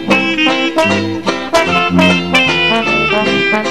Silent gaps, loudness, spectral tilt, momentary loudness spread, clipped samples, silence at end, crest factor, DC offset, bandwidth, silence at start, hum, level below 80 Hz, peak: none; -11 LUFS; -4.5 dB/octave; 4 LU; under 0.1%; 0 s; 12 dB; 1%; 14 kHz; 0 s; none; -42 dBFS; 0 dBFS